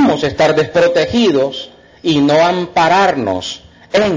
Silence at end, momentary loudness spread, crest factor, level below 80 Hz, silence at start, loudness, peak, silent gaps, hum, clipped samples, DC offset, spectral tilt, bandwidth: 0 s; 12 LU; 12 dB; -44 dBFS; 0 s; -13 LUFS; -2 dBFS; none; none; under 0.1%; under 0.1%; -5 dB/octave; 7.6 kHz